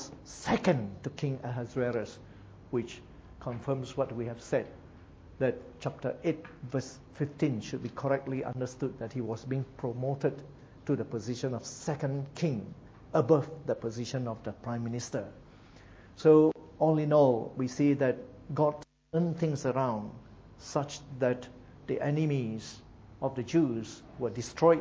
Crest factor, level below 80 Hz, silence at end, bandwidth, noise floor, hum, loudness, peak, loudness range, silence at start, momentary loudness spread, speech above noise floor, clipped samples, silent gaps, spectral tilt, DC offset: 22 dB; -60 dBFS; 0 s; 8 kHz; -54 dBFS; none; -32 LUFS; -10 dBFS; 8 LU; 0 s; 16 LU; 23 dB; under 0.1%; none; -7 dB/octave; under 0.1%